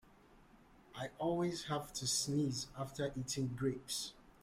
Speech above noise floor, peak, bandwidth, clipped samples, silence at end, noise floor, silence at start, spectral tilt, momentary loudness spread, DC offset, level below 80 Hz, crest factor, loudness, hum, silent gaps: 25 dB; -24 dBFS; 16 kHz; under 0.1%; 0.15 s; -64 dBFS; 0.3 s; -4 dB/octave; 11 LU; under 0.1%; -66 dBFS; 16 dB; -39 LUFS; none; none